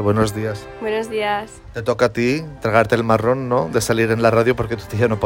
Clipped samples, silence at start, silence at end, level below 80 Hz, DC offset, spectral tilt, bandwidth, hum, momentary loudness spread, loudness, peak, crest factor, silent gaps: under 0.1%; 0 s; 0 s; -44 dBFS; under 0.1%; -6 dB/octave; 16.5 kHz; none; 10 LU; -19 LUFS; -2 dBFS; 16 dB; none